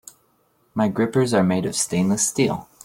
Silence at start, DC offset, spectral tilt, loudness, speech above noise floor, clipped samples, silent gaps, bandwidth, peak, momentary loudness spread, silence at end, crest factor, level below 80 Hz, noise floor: 0.75 s; under 0.1%; -4.5 dB/octave; -21 LUFS; 43 dB; under 0.1%; none; 16.5 kHz; -6 dBFS; 4 LU; 0.2 s; 16 dB; -56 dBFS; -63 dBFS